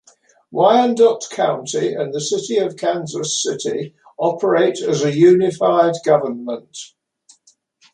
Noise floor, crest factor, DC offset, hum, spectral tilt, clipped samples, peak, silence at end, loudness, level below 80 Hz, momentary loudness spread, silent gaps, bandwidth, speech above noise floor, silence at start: -57 dBFS; 16 dB; under 0.1%; none; -4.5 dB/octave; under 0.1%; -2 dBFS; 1.1 s; -17 LUFS; -66 dBFS; 15 LU; none; 10.5 kHz; 40 dB; 0.5 s